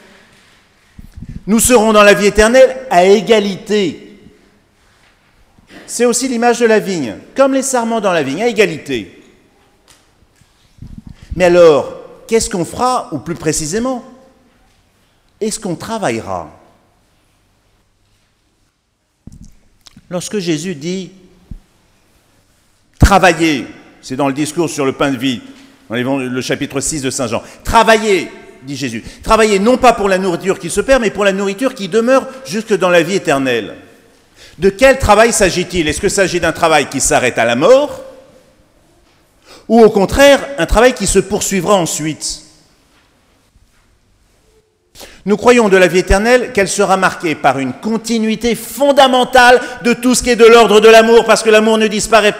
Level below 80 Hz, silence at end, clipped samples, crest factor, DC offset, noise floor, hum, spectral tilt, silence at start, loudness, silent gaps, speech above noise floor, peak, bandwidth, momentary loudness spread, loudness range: -32 dBFS; 0 s; 0.4%; 14 dB; under 0.1%; -63 dBFS; none; -4 dB/octave; 1 s; -12 LUFS; none; 51 dB; 0 dBFS; 16.5 kHz; 14 LU; 14 LU